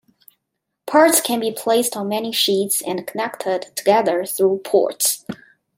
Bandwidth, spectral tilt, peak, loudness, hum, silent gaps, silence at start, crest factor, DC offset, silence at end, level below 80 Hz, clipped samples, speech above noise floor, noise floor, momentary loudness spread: 16.5 kHz; -2.5 dB/octave; -2 dBFS; -18 LUFS; none; none; 0.85 s; 18 dB; under 0.1%; 0.4 s; -72 dBFS; under 0.1%; 59 dB; -78 dBFS; 11 LU